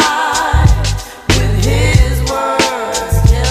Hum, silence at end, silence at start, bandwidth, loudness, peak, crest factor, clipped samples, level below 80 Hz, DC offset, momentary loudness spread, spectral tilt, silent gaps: none; 0 s; 0 s; 15.5 kHz; -13 LUFS; 0 dBFS; 12 dB; 0.2%; -16 dBFS; under 0.1%; 5 LU; -4.5 dB/octave; none